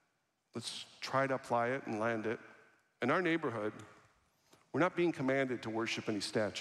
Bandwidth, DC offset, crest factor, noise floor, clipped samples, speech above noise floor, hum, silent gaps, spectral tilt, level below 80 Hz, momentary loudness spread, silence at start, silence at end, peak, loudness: 13 kHz; under 0.1%; 18 dB; -81 dBFS; under 0.1%; 45 dB; none; none; -5 dB/octave; -80 dBFS; 11 LU; 0.55 s; 0 s; -18 dBFS; -36 LUFS